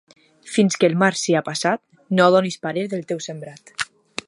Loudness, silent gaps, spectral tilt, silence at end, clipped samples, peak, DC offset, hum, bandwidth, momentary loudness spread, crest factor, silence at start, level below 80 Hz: -20 LUFS; none; -4.5 dB/octave; 0.45 s; under 0.1%; -2 dBFS; under 0.1%; none; 11.5 kHz; 13 LU; 20 dB; 0.45 s; -68 dBFS